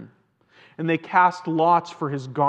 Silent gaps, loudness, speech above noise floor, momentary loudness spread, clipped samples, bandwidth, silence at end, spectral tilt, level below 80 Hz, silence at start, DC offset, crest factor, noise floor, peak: none; -22 LUFS; 38 dB; 10 LU; under 0.1%; 8.6 kHz; 0 s; -7 dB/octave; -80 dBFS; 0 s; under 0.1%; 20 dB; -59 dBFS; -4 dBFS